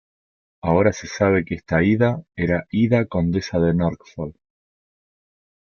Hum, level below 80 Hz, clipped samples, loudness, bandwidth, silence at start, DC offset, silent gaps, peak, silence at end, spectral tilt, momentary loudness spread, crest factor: none; -48 dBFS; under 0.1%; -20 LUFS; 7 kHz; 0.65 s; under 0.1%; none; -4 dBFS; 1.3 s; -7.5 dB/octave; 11 LU; 18 dB